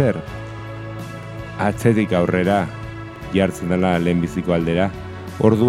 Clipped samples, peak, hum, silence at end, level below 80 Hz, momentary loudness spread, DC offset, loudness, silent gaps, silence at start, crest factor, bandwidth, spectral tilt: under 0.1%; 0 dBFS; none; 0 s; -42 dBFS; 14 LU; under 0.1%; -19 LUFS; none; 0 s; 20 dB; 14.5 kHz; -7.5 dB/octave